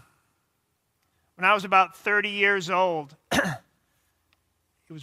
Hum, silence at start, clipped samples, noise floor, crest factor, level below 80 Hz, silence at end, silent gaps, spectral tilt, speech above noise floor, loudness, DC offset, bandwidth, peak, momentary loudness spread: none; 1.4 s; under 0.1%; -74 dBFS; 22 dB; -64 dBFS; 0 s; none; -3.5 dB/octave; 51 dB; -23 LUFS; under 0.1%; 16 kHz; -4 dBFS; 9 LU